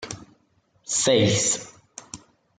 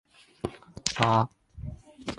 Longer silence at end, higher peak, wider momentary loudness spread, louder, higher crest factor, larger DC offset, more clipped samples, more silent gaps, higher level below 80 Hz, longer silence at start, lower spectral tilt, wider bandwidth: first, 0.4 s vs 0 s; about the same, -6 dBFS vs -4 dBFS; first, 24 LU vs 19 LU; first, -21 LUFS vs -28 LUFS; second, 20 dB vs 28 dB; neither; neither; neither; second, -62 dBFS vs -52 dBFS; second, 0 s vs 0.45 s; second, -3 dB/octave vs -4.5 dB/octave; second, 9.8 kHz vs 11.5 kHz